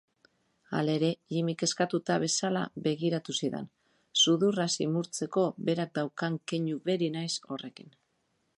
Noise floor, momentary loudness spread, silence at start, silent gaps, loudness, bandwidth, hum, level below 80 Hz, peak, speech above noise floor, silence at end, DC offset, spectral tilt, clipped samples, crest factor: -76 dBFS; 9 LU; 0.7 s; none; -30 LUFS; 11.5 kHz; none; -76 dBFS; -12 dBFS; 46 dB; 0.7 s; under 0.1%; -4 dB/octave; under 0.1%; 18 dB